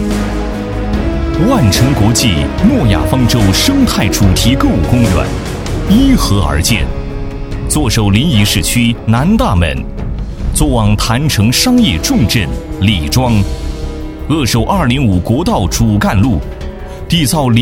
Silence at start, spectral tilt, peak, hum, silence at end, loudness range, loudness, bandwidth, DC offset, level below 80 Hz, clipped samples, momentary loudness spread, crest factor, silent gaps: 0 s; -5 dB/octave; 0 dBFS; none; 0 s; 3 LU; -12 LUFS; 17 kHz; under 0.1%; -20 dBFS; under 0.1%; 11 LU; 12 dB; none